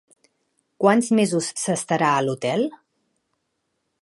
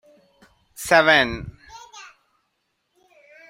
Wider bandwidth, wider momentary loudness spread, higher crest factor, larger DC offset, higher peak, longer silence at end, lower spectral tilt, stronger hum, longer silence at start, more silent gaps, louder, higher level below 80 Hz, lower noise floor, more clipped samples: second, 11.5 kHz vs 16 kHz; second, 6 LU vs 27 LU; about the same, 20 dB vs 22 dB; neither; about the same, -4 dBFS vs -2 dBFS; second, 1.3 s vs 1.45 s; first, -4.5 dB/octave vs -3 dB/octave; neither; about the same, 0.8 s vs 0.8 s; neither; second, -21 LUFS vs -17 LUFS; second, -74 dBFS vs -52 dBFS; about the same, -75 dBFS vs -73 dBFS; neither